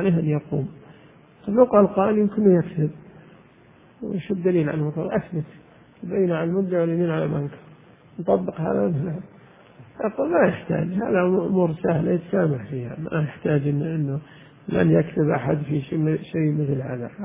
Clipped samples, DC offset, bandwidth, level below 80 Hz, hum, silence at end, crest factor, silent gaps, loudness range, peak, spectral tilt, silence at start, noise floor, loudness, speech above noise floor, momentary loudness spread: under 0.1%; under 0.1%; 3.7 kHz; -54 dBFS; none; 0 s; 20 dB; none; 4 LU; -2 dBFS; -12.5 dB/octave; 0 s; -52 dBFS; -23 LUFS; 30 dB; 12 LU